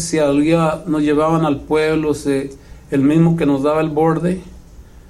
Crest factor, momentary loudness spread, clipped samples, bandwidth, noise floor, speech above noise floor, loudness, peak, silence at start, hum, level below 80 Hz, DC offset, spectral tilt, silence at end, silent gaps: 14 dB; 8 LU; under 0.1%; 13 kHz; -40 dBFS; 24 dB; -16 LUFS; -2 dBFS; 0 s; none; -40 dBFS; under 0.1%; -6.5 dB/octave; 0.1 s; none